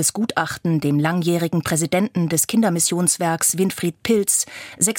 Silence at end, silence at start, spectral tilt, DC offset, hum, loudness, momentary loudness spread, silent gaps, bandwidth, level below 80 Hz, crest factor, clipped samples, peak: 0 s; 0 s; -4 dB/octave; under 0.1%; none; -19 LUFS; 5 LU; none; 17 kHz; -58 dBFS; 18 dB; under 0.1%; -2 dBFS